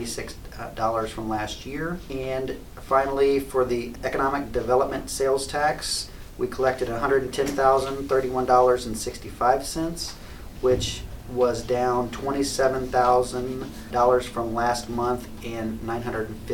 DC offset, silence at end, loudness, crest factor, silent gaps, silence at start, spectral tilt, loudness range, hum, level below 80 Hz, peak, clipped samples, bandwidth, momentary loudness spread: under 0.1%; 0 s; -25 LUFS; 18 dB; none; 0 s; -4.5 dB/octave; 3 LU; none; -42 dBFS; -6 dBFS; under 0.1%; 19 kHz; 11 LU